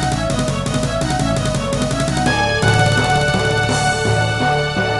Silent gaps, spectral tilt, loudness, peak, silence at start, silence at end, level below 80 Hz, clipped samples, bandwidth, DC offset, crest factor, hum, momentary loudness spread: none; -4.5 dB/octave; -17 LUFS; -2 dBFS; 0 s; 0 s; -32 dBFS; under 0.1%; 12 kHz; under 0.1%; 16 dB; none; 5 LU